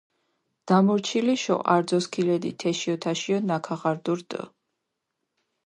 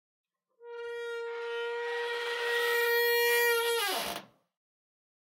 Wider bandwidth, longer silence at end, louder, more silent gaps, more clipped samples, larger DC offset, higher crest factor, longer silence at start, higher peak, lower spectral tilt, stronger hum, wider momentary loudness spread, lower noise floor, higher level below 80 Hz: second, 11 kHz vs 16 kHz; about the same, 1.15 s vs 1.15 s; first, -25 LUFS vs -29 LUFS; neither; neither; neither; first, 22 dB vs 16 dB; about the same, 0.65 s vs 0.6 s; first, -4 dBFS vs -18 dBFS; first, -5.5 dB/octave vs 0.5 dB/octave; neither; second, 8 LU vs 14 LU; first, -81 dBFS vs -51 dBFS; first, -72 dBFS vs -78 dBFS